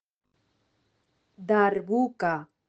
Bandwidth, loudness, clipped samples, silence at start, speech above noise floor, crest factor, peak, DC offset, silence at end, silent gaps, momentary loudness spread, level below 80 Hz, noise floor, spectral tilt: 8 kHz; -26 LUFS; under 0.1%; 1.4 s; 48 dB; 20 dB; -8 dBFS; under 0.1%; 0.25 s; none; 6 LU; -74 dBFS; -73 dBFS; -8 dB/octave